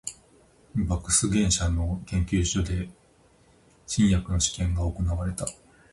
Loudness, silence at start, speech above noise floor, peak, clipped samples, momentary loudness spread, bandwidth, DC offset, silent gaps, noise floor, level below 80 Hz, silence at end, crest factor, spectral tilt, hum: -26 LUFS; 0.05 s; 34 dB; -10 dBFS; under 0.1%; 11 LU; 11.5 kHz; under 0.1%; none; -59 dBFS; -34 dBFS; 0.4 s; 18 dB; -4.5 dB/octave; none